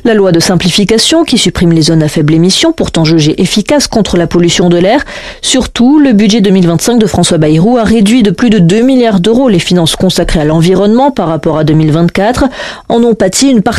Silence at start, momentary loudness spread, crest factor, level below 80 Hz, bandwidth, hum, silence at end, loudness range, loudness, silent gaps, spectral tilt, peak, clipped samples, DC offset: 0.05 s; 4 LU; 6 dB; -28 dBFS; 13.5 kHz; none; 0 s; 2 LU; -7 LUFS; none; -5 dB/octave; 0 dBFS; under 0.1%; 1%